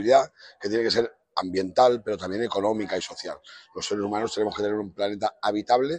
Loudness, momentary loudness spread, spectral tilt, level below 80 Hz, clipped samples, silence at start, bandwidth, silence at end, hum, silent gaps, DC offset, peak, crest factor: -26 LUFS; 13 LU; -4.5 dB/octave; -64 dBFS; under 0.1%; 0 s; 9.8 kHz; 0 s; none; none; under 0.1%; -6 dBFS; 20 dB